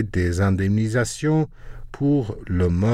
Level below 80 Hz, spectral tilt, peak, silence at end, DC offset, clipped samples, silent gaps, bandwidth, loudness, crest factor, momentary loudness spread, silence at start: -40 dBFS; -7 dB/octave; -8 dBFS; 0 s; under 0.1%; under 0.1%; none; 12.5 kHz; -22 LUFS; 12 dB; 6 LU; 0 s